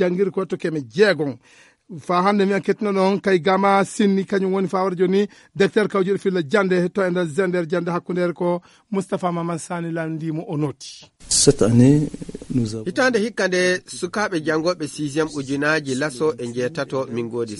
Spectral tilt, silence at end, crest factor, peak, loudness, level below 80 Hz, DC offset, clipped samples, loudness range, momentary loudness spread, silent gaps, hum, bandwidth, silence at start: -5 dB/octave; 0 s; 20 dB; 0 dBFS; -20 LUFS; -50 dBFS; under 0.1%; under 0.1%; 4 LU; 10 LU; none; none; 11.5 kHz; 0 s